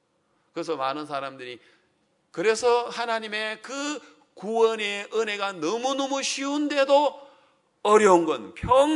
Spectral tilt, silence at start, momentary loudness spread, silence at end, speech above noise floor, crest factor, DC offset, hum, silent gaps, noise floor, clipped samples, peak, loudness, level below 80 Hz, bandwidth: -3.5 dB/octave; 0.55 s; 16 LU; 0 s; 45 dB; 22 dB; under 0.1%; none; none; -69 dBFS; under 0.1%; -4 dBFS; -24 LUFS; -58 dBFS; 11 kHz